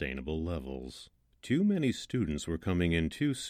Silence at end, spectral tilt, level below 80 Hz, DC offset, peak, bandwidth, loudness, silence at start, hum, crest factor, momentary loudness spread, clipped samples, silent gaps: 0 s; -6 dB/octave; -48 dBFS; under 0.1%; -16 dBFS; 15 kHz; -32 LUFS; 0 s; none; 16 dB; 14 LU; under 0.1%; none